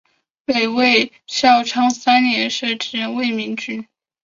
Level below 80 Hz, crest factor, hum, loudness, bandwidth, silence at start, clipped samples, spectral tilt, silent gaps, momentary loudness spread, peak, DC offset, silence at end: -64 dBFS; 16 dB; none; -17 LUFS; 7.6 kHz; 0.5 s; under 0.1%; -2.5 dB/octave; none; 11 LU; -2 dBFS; under 0.1%; 0.4 s